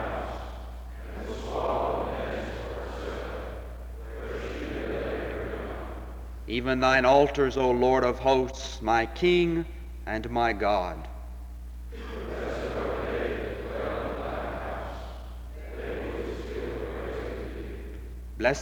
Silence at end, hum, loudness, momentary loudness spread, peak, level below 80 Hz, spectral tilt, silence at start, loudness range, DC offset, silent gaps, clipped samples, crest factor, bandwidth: 0 s; none; -29 LUFS; 18 LU; -8 dBFS; -40 dBFS; -6 dB/octave; 0 s; 11 LU; under 0.1%; none; under 0.1%; 20 dB; 19.5 kHz